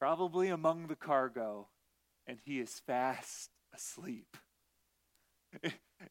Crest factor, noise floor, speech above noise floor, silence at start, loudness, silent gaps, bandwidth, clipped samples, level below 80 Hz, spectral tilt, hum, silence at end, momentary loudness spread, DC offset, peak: 22 dB; -79 dBFS; 41 dB; 0 s; -38 LUFS; none; 16.5 kHz; under 0.1%; -84 dBFS; -4.5 dB/octave; none; 0 s; 16 LU; under 0.1%; -18 dBFS